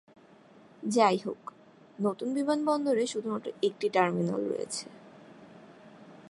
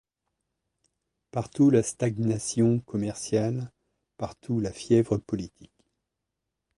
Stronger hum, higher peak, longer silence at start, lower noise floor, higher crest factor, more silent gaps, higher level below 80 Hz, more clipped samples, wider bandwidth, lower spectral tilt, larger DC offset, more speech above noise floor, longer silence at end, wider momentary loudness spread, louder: neither; about the same, -10 dBFS vs -10 dBFS; second, 0.8 s vs 1.35 s; second, -56 dBFS vs -84 dBFS; about the same, 22 dB vs 18 dB; neither; second, -80 dBFS vs -58 dBFS; neither; about the same, 11.5 kHz vs 11.5 kHz; second, -5 dB/octave vs -6.5 dB/octave; neither; second, 27 dB vs 58 dB; second, 0 s vs 1.15 s; about the same, 14 LU vs 15 LU; second, -30 LUFS vs -27 LUFS